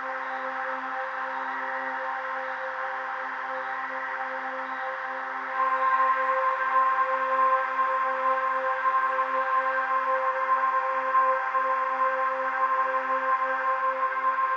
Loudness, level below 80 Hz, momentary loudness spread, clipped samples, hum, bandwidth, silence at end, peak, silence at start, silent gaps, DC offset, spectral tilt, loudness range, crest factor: -26 LUFS; under -90 dBFS; 8 LU; under 0.1%; none; 7 kHz; 0 s; -12 dBFS; 0 s; none; under 0.1%; -2.5 dB/octave; 7 LU; 14 dB